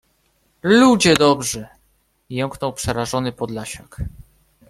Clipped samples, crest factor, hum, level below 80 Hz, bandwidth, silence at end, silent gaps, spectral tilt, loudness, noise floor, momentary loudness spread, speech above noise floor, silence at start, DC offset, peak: under 0.1%; 20 dB; none; -44 dBFS; 15 kHz; 0.6 s; none; -4.5 dB/octave; -18 LUFS; -63 dBFS; 19 LU; 45 dB; 0.65 s; under 0.1%; 0 dBFS